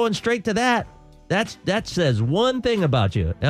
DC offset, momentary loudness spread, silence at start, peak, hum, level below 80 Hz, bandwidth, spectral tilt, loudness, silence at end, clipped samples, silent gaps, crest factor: under 0.1%; 4 LU; 0 s; -6 dBFS; none; -44 dBFS; 14.5 kHz; -5.5 dB/octave; -22 LUFS; 0 s; under 0.1%; none; 14 dB